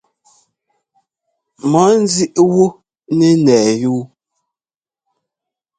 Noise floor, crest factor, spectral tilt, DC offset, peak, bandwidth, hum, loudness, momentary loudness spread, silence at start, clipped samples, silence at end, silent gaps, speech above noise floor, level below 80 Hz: under -90 dBFS; 16 dB; -5.5 dB/octave; under 0.1%; 0 dBFS; 9.4 kHz; none; -13 LUFS; 9 LU; 1.65 s; under 0.1%; 1.7 s; none; over 78 dB; -58 dBFS